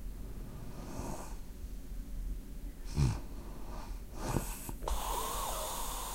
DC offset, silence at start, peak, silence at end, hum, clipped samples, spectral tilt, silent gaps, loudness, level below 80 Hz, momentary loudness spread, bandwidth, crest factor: under 0.1%; 0 s; -16 dBFS; 0 s; none; under 0.1%; -4.5 dB/octave; none; -40 LUFS; -42 dBFS; 13 LU; 16 kHz; 22 dB